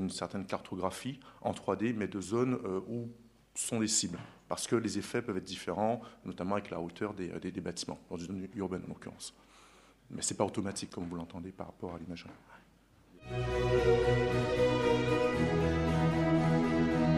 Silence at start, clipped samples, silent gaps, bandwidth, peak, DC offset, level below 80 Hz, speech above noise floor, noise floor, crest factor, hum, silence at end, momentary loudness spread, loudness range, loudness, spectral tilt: 0 s; under 0.1%; none; 13 kHz; -14 dBFS; under 0.1%; -50 dBFS; 29 dB; -63 dBFS; 20 dB; none; 0 s; 15 LU; 10 LU; -33 LUFS; -5 dB/octave